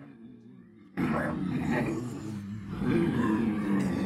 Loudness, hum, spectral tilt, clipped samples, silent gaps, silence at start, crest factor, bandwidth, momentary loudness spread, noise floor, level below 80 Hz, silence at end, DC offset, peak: -30 LUFS; none; -7.5 dB/octave; under 0.1%; none; 0 s; 16 dB; 13.5 kHz; 13 LU; -52 dBFS; -54 dBFS; 0 s; under 0.1%; -16 dBFS